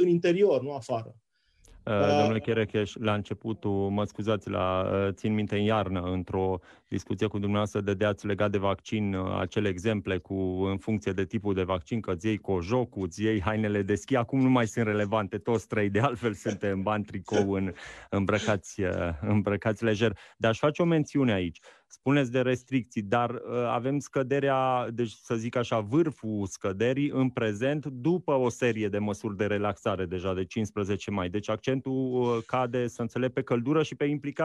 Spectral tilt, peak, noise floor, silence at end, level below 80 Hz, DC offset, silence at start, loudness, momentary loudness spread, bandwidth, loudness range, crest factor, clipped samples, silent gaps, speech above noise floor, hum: -6.5 dB/octave; -10 dBFS; -59 dBFS; 0 s; -58 dBFS; under 0.1%; 0 s; -29 LUFS; 6 LU; 12 kHz; 2 LU; 18 dB; under 0.1%; none; 31 dB; none